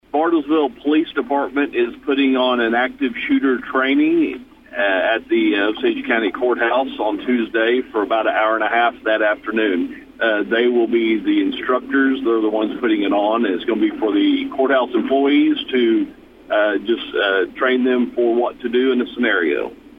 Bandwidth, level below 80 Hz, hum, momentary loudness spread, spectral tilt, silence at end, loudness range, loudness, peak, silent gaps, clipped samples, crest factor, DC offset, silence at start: 5 kHz; -56 dBFS; none; 5 LU; -6.5 dB/octave; 0.25 s; 1 LU; -18 LUFS; -4 dBFS; none; under 0.1%; 12 dB; under 0.1%; 0.15 s